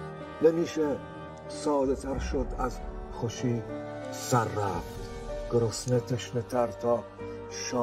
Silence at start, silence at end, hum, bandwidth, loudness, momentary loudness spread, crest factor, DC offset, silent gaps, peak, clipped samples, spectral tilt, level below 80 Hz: 0 s; 0 s; none; 16 kHz; -31 LUFS; 13 LU; 20 dB; under 0.1%; none; -10 dBFS; under 0.1%; -5.5 dB/octave; -44 dBFS